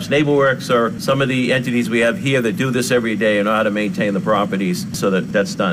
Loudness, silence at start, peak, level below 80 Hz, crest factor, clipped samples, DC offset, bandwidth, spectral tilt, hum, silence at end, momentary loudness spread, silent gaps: -17 LUFS; 0 s; -6 dBFS; -52 dBFS; 10 dB; under 0.1%; under 0.1%; 16 kHz; -5.5 dB/octave; none; 0 s; 4 LU; none